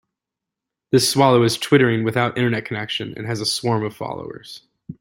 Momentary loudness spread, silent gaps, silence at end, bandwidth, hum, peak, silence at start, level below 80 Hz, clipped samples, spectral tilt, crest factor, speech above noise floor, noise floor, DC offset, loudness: 17 LU; none; 0.1 s; 16.5 kHz; none; -2 dBFS; 0.9 s; -58 dBFS; under 0.1%; -5 dB/octave; 18 dB; 66 dB; -85 dBFS; under 0.1%; -19 LUFS